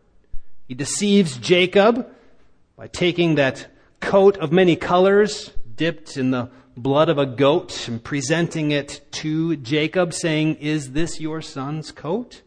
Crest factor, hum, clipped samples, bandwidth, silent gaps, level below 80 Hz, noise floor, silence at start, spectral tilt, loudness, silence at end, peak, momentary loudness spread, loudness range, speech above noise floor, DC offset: 18 dB; none; under 0.1%; 10.5 kHz; none; -46 dBFS; -54 dBFS; 0.35 s; -5 dB/octave; -20 LUFS; 0.1 s; -2 dBFS; 14 LU; 4 LU; 35 dB; under 0.1%